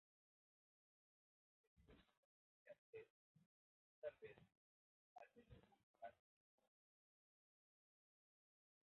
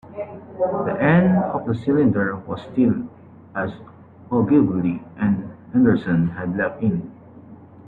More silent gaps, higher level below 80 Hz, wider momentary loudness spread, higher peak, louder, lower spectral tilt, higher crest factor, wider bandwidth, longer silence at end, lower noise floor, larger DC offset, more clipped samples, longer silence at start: first, 2.17-2.66 s, 2.78-2.93 s, 3.10-3.35 s, 3.46-4.02 s, 4.57-5.16 s, 5.83-5.94 s vs none; second, -88 dBFS vs -54 dBFS; second, 11 LU vs 14 LU; second, -42 dBFS vs -4 dBFS; second, -63 LUFS vs -21 LUFS; second, -4 dB/octave vs -11 dB/octave; first, 26 dB vs 16 dB; about the same, 4 kHz vs 4.3 kHz; first, 2.85 s vs 0.05 s; first, under -90 dBFS vs -43 dBFS; neither; neither; first, 1.75 s vs 0.05 s